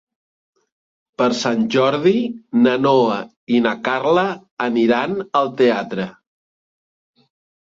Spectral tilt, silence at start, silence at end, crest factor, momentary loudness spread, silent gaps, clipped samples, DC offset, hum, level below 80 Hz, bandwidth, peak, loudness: -5.5 dB/octave; 1.2 s; 1.6 s; 16 dB; 9 LU; 3.36-3.47 s, 4.51-4.57 s; under 0.1%; under 0.1%; none; -64 dBFS; 7.6 kHz; -2 dBFS; -18 LUFS